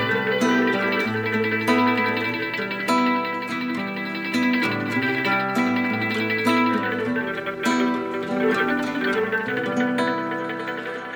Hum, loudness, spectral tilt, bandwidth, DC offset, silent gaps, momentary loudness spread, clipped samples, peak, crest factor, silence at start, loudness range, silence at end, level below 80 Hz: none; -22 LUFS; -5 dB/octave; over 20 kHz; under 0.1%; none; 7 LU; under 0.1%; -6 dBFS; 16 dB; 0 s; 2 LU; 0 s; -62 dBFS